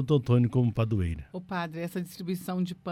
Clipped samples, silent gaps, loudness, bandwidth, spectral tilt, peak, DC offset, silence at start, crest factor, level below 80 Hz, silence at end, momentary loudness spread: under 0.1%; none; -29 LUFS; 15 kHz; -8 dB/octave; -10 dBFS; under 0.1%; 0 s; 18 dB; -48 dBFS; 0 s; 11 LU